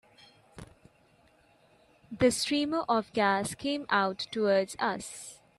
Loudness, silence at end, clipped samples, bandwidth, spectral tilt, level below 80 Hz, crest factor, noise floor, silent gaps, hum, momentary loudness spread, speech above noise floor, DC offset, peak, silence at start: -29 LUFS; 0.25 s; under 0.1%; 14 kHz; -3.5 dB/octave; -62 dBFS; 20 dB; -64 dBFS; none; none; 10 LU; 35 dB; under 0.1%; -12 dBFS; 0.55 s